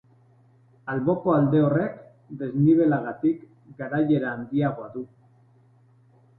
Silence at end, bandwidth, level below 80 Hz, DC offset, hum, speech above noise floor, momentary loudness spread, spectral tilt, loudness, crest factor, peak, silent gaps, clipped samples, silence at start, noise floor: 1.35 s; 4.1 kHz; -62 dBFS; under 0.1%; none; 34 dB; 18 LU; -12 dB/octave; -24 LUFS; 16 dB; -10 dBFS; none; under 0.1%; 0.85 s; -58 dBFS